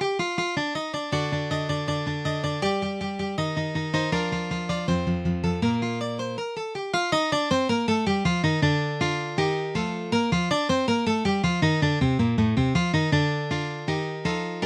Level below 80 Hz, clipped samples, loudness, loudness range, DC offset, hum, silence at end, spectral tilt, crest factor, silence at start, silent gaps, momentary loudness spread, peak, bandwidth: -48 dBFS; under 0.1%; -25 LUFS; 4 LU; under 0.1%; none; 0 s; -6 dB/octave; 16 dB; 0 s; none; 6 LU; -10 dBFS; 11 kHz